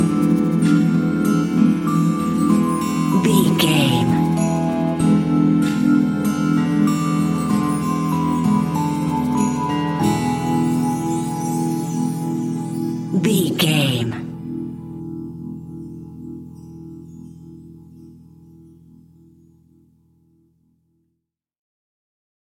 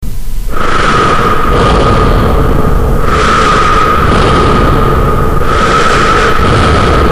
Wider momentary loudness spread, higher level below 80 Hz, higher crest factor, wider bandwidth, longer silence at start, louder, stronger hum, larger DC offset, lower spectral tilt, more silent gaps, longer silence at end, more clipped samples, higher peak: first, 17 LU vs 4 LU; second, -50 dBFS vs -12 dBFS; first, 16 dB vs 6 dB; about the same, 17 kHz vs 15.5 kHz; about the same, 0 s vs 0 s; second, -19 LUFS vs -8 LUFS; neither; neither; about the same, -6 dB/octave vs -5.5 dB/octave; neither; first, 4.3 s vs 0 s; neither; about the same, -2 dBFS vs 0 dBFS